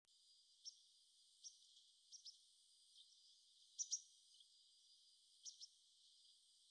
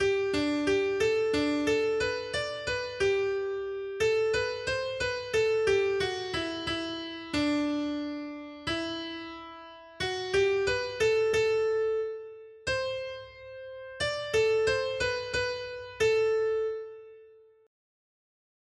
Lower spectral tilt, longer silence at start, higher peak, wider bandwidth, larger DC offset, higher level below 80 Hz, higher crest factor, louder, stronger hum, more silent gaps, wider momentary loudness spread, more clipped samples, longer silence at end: second, 6 dB/octave vs -4 dB/octave; about the same, 0.05 s vs 0 s; second, -34 dBFS vs -14 dBFS; second, 10 kHz vs 12 kHz; neither; second, under -90 dBFS vs -56 dBFS; first, 28 dB vs 16 dB; second, -55 LUFS vs -29 LUFS; neither; neither; first, 21 LU vs 14 LU; neither; second, 0 s vs 1.35 s